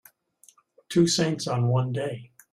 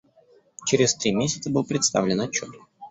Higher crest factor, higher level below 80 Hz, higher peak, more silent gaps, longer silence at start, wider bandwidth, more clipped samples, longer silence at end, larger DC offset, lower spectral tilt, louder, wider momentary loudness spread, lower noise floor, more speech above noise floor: about the same, 18 dB vs 20 dB; about the same, -62 dBFS vs -58 dBFS; second, -10 dBFS vs -4 dBFS; neither; first, 0.9 s vs 0.6 s; first, 14.5 kHz vs 8.4 kHz; neither; first, 0.25 s vs 0 s; neither; first, -5.5 dB/octave vs -3.5 dB/octave; about the same, -25 LUFS vs -23 LUFS; about the same, 11 LU vs 9 LU; about the same, -60 dBFS vs -58 dBFS; about the same, 36 dB vs 34 dB